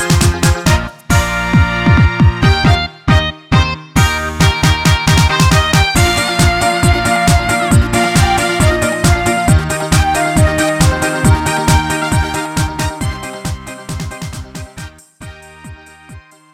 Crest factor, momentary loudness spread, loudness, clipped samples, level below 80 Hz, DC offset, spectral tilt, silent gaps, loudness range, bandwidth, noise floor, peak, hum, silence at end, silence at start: 12 dB; 13 LU; -12 LUFS; under 0.1%; -22 dBFS; under 0.1%; -4.5 dB/octave; none; 10 LU; 16.5 kHz; -37 dBFS; 0 dBFS; none; 0.35 s; 0 s